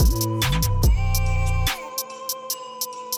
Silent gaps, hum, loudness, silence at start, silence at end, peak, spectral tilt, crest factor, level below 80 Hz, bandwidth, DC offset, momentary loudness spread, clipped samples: none; none; -24 LUFS; 0 s; 0 s; -10 dBFS; -4 dB/octave; 12 dB; -24 dBFS; over 20 kHz; under 0.1%; 9 LU; under 0.1%